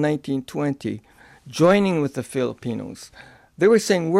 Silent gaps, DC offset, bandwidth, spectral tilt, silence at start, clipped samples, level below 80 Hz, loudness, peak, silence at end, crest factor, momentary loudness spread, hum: none; under 0.1%; 15 kHz; -6 dB/octave; 0 s; under 0.1%; -60 dBFS; -21 LUFS; -6 dBFS; 0 s; 16 dB; 19 LU; none